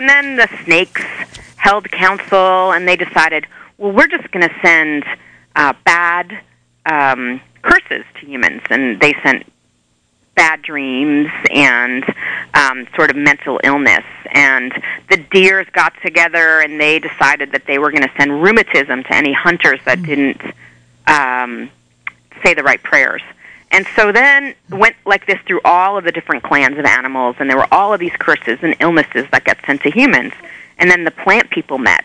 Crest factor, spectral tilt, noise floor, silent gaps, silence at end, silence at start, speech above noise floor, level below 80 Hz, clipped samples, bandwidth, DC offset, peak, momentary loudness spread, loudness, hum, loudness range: 14 dB; -4 dB/octave; -59 dBFS; none; 0.05 s; 0 s; 46 dB; -48 dBFS; under 0.1%; 10 kHz; under 0.1%; 0 dBFS; 11 LU; -12 LUFS; none; 3 LU